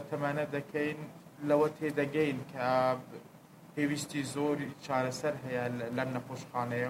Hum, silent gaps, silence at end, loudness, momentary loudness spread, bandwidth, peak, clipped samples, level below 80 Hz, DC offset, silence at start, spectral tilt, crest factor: none; none; 0 s; -33 LUFS; 10 LU; 16 kHz; -14 dBFS; under 0.1%; -72 dBFS; under 0.1%; 0 s; -6 dB/octave; 20 dB